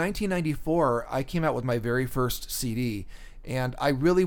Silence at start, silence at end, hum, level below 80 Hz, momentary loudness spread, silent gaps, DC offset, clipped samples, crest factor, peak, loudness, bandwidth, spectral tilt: 0 s; 0 s; none; -42 dBFS; 8 LU; none; under 0.1%; under 0.1%; 16 dB; -10 dBFS; -28 LUFS; 19 kHz; -6 dB/octave